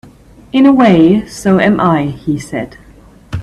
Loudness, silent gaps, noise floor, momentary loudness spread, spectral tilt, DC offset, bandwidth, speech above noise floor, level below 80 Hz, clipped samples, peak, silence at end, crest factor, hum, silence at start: -11 LUFS; none; -40 dBFS; 15 LU; -7 dB/octave; under 0.1%; 12.5 kHz; 30 dB; -40 dBFS; under 0.1%; 0 dBFS; 0 s; 12 dB; none; 0.55 s